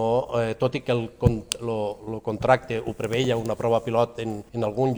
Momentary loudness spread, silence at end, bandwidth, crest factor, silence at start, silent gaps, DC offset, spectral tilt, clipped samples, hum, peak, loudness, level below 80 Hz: 8 LU; 0 s; over 20 kHz; 22 dB; 0 s; none; under 0.1%; -6 dB/octave; under 0.1%; none; -2 dBFS; -25 LUFS; -44 dBFS